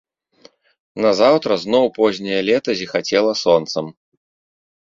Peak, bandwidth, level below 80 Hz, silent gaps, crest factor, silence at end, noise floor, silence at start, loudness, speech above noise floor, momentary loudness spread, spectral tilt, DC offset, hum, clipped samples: -2 dBFS; 7.6 kHz; -60 dBFS; none; 18 dB; 1 s; -51 dBFS; 0.95 s; -17 LUFS; 34 dB; 10 LU; -4.5 dB/octave; under 0.1%; none; under 0.1%